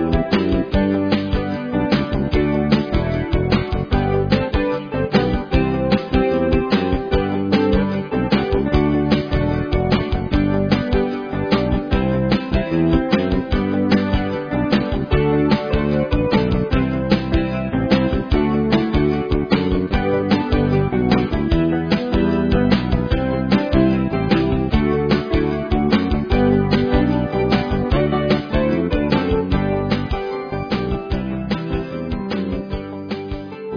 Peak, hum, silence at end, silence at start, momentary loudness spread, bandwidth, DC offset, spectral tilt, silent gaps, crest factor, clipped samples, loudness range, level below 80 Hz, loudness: 0 dBFS; none; 0 s; 0 s; 5 LU; 5.4 kHz; under 0.1%; -8.5 dB/octave; none; 18 dB; under 0.1%; 2 LU; -26 dBFS; -19 LUFS